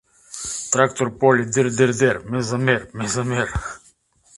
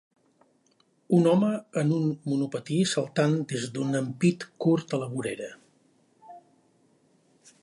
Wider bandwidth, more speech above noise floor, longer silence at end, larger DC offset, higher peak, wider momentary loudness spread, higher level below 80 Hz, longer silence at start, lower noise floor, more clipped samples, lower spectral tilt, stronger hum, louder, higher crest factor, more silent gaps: about the same, 11.5 kHz vs 11.5 kHz; second, 37 dB vs 41 dB; second, 0.6 s vs 1.25 s; neither; first, 0 dBFS vs -10 dBFS; first, 13 LU vs 9 LU; first, -44 dBFS vs -72 dBFS; second, 0.3 s vs 1.1 s; second, -56 dBFS vs -67 dBFS; neither; second, -4.5 dB/octave vs -6.5 dB/octave; neither; first, -20 LUFS vs -27 LUFS; about the same, 20 dB vs 18 dB; neither